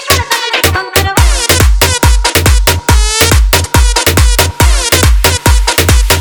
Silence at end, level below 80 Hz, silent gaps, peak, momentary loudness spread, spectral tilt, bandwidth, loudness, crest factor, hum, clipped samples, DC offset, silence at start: 0 s; -12 dBFS; none; 0 dBFS; 2 LU; -3 dB/octave; over 20 kHz; -8 LUFS; 8 dB; none; 0.9%; under 0.1%; 0 s